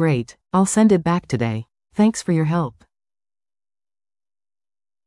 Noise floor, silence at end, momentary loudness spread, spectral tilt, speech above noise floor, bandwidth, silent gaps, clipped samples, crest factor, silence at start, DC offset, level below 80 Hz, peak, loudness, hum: under -90 dBFS; 2.35 s; 11 LU; -6.5 dB/octave; over 72 dB; 12 kHz; none; under 0.1%; 16 dB; 0 s; under 0.1%; -56 dBFS; -6 dBFS; -19 LUFS; none